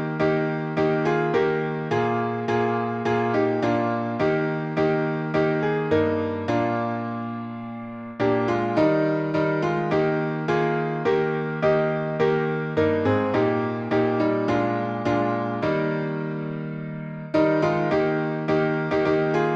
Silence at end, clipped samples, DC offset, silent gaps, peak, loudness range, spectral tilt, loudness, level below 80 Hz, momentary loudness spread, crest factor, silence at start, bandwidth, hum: 0 s; under 0.1%; under 0.1%; none; -8 dBFS; 2 LU; -8 dB/octave; -23 LUFS; -56 dBFS; 6 LU; 14 dB; 0 s; 7.4 kHz; none